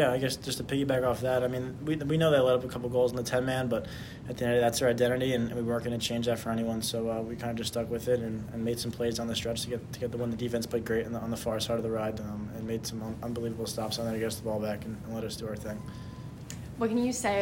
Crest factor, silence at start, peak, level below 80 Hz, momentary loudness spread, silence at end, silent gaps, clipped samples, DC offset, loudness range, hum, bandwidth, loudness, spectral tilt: 18 dB; 0 s; -12 dBFS; -54 dBFS; 11 LU; 0 s; none; under 0.1%; under 0.1%; 6 LU; none; 16.5 kHz; -31 LUFS; -5 dB/octave